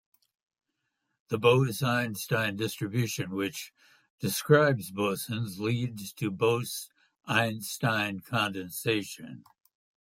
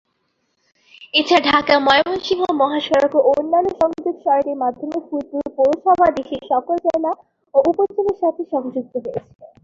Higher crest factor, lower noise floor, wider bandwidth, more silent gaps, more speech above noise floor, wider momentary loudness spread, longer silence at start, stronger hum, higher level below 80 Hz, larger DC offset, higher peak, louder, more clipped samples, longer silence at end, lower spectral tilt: about the same, 22 dB vs 18 dB; first, -82 dBFS vs -69 dBFS; first, 16.5 kHz vs 7.6 kHz; first, 4.10-4.18 s vs none; about the same, 53 dB vs 51 dB; about the same, 13 LU vs 11 LU; first, 1.3 s vs 1 s; neither; second, -70 dBFS vs -54 dBFS; neither; second, -8 dBFS vs 0 dBFS; second, -29 LUFS vs -18 LUFS; neither; first, 0.65 s vs 0.15 s; about the same, -5 dB/octave vs -4.5 dB/octave